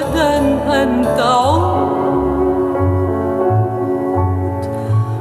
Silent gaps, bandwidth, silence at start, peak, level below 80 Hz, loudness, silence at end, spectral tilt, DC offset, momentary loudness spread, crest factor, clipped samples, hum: none; 14 kHz; 0 s; -2 dBFS; -34 dBFS; -16 LUFS; 0 s; -7 dB/octave; under 0.1%; 5 LU; 12 dB; under 0.1%; none